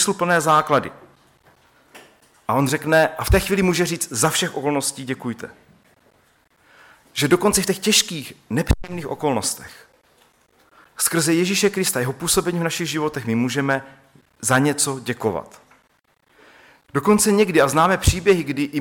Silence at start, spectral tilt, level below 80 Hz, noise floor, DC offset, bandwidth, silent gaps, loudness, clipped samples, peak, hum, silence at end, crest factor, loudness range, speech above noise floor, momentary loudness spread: 0 s; -4 dB/octave; -36 dBFS; -62 dBFS; under 0.1%; 17.5 kHz; none; -19 LUFS; under 0.1%; -2 dBFS; none; 0 s; 20 dB; 4 LU; 43 dB; 11 LU